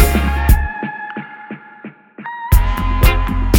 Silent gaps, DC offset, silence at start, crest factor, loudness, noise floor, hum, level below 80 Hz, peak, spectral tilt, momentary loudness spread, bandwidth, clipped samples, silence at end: none; under 0.1%; 0 s; 14 dB; -17 LUFS; -37 dBFS; none; -16 dBFS; 0 dBFS; -5.5 dB/octave; 18 LU; 17.5 kHz; under 0.1%; 0 s